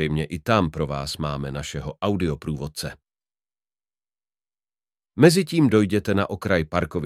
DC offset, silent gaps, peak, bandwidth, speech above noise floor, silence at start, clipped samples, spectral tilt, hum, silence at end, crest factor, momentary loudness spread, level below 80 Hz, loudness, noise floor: under 0.1%; none; -2 dBFS; 15.5 kHz; over 68 dB; 0 s; under 0.1%; -6 dB/octave; none; 0 s; 22 dB; 13 LU; -44 dBFS; -23 LUFS; under -90 dBFS